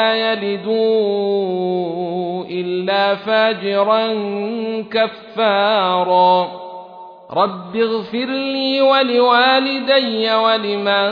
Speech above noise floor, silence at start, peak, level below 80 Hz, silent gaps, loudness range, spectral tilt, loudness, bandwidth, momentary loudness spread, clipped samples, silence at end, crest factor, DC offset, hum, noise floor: 20 dB; 0 s; -2 dBFS; -70 dBFS; none; 3 LU; -7 dB/octave; -17 LUFS; 5.2 kHz; 9 LU; under 0.1%; 0 s; 16 dB; under 0.1%; none; -37 dBFS